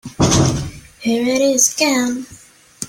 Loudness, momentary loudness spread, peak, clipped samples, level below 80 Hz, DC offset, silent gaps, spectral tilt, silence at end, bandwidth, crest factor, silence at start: -16 LUFS; 14 LU; 0 dBFS; under 0.1%; -38 dBFS; under 0.1%; none; -4 dB/octave; 0 s; 16.5 kHz; 18 dB; 0.05 s